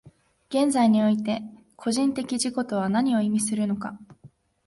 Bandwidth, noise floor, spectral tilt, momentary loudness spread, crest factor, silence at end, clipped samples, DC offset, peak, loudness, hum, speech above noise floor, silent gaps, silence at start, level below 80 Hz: 11.5 kHz; -54 dBFS; -5 dB/octave; 12 LU; 16 dB; 0.4 s; under 0.1%; under 0.1%; -10 dBFS; -24 LUFS; none; 30 dB; none; 0.05 s; -66 dBFS